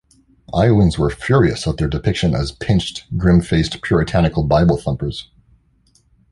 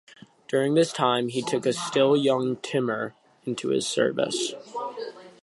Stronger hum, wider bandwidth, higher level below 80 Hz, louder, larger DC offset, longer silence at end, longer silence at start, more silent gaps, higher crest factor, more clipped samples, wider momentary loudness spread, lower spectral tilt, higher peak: neither; about the same, 11.5 kHz vs 11.5 kHz; first, -30 dBFS vs -74 dBFS; first, -17 LUFS vs -25 LUFS; neither; first, 1.1 s vs 0.15 s; about the same, 0.5 s vs 0.5 s; neither; about the same, 16 dB vs 18 dB; neither; second, 8 LU vs 13 LU; first, -7 dB/octave vs -4.5 dB/octave; first, 0 dBFS vs -8 dBFS